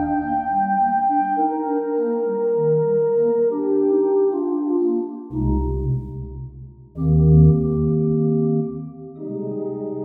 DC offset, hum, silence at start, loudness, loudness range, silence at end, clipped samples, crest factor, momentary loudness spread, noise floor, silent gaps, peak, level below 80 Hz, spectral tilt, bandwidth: under 0.1%; none; 0 s; -20 LUFS; 2 LU; 0 s; under 0.1%; 16 dB; 13 LU; -39 dBFS; none; -4 dBFS; -34 dBFS; -14 dB/octave; 2.5 kHz